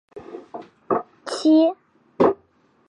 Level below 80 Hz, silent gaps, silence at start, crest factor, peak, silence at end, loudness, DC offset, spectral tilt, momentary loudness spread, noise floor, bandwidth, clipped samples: -62 dBFS; none; 0.15 s; 18 dB; -4 dBFS; 0.55 s; -21 LUFS; under 0.1%; -5.5 dB/octave; 23 LU; -60 dBFS; 10.5 kHz; under 0.1%